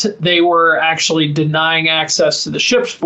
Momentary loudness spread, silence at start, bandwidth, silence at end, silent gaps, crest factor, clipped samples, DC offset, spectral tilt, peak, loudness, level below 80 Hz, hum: 4 LU; 0 s; 8.4 kHz; 0 s; none; 12 dB; under 0.1%; under 0.1%; -3.5 dB/octave; -2 dBFS; -13 LUFS; -58 dBFS; none